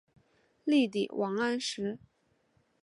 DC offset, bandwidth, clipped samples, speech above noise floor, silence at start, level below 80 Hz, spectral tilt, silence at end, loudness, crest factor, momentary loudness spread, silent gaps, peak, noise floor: under 0.1%; 11.5 kHz; under 0.1%; 42 dB; 0.65 s; -76 dBFS; -4.5 dB/octave; 0.85 s; -31 LUFS; 18 dB; 11 LU; none; -16 dBFS; -72 dBFS